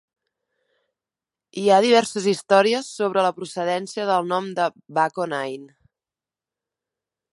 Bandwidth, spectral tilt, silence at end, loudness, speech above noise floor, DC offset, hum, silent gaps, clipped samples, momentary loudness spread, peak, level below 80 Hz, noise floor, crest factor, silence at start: 11.5 kHz; -4 dB/octave; 1.7 s; -21 LUFS; over 69 dB; under 0.1%; none; none; under 0.1%; 10 LU; -2 dBFS; -76 dBFS; under -90 dBFS; 20 dB; 1.55 s